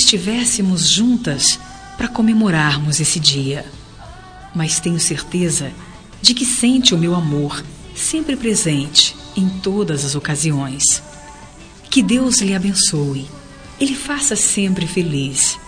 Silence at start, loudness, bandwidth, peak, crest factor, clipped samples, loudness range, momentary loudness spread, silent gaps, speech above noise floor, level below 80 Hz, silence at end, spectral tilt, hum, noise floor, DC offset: 0 s; -16 LUFS; 11 kHz; 0 dBFS; 18 dB; under 0.1%; 3 LU; 11 LU; none; 22 dB; -42 dBFS; 0 s; -3 dB/octave; none; -38 dBFS; under 0.1%